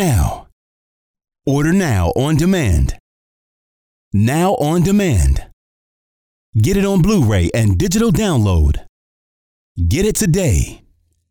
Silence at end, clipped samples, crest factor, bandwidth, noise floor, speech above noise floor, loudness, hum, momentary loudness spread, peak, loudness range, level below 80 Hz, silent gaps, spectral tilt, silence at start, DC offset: 0.55 s; under 0.1%; 10 dB; 19.5 kHz; under -90 dBFS; over 76 dB; -16 LUFS; none; 8 LU; -6 dBFS; 2 LU; -24 dBFS; 0.52-1.14 s, 3.00-4.11 s, 5.53-6.53 s, 8.89-9.75 s; -6 dB/octave; 0 s; under 0.1%